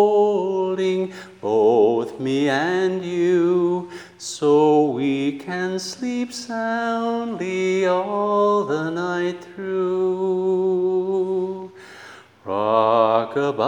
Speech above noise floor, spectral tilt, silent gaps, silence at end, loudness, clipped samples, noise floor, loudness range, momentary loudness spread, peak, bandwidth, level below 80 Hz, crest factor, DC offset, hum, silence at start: 24 dB; -5.5 dB/octave; none; 0 s; -21 LUFS; under 0.1%; -44 dBFS; 3 LU; 11 LU; -4 dBFS; 11 kHz; -74 dBFS; 16 dB; under 0.1%; none; 0 s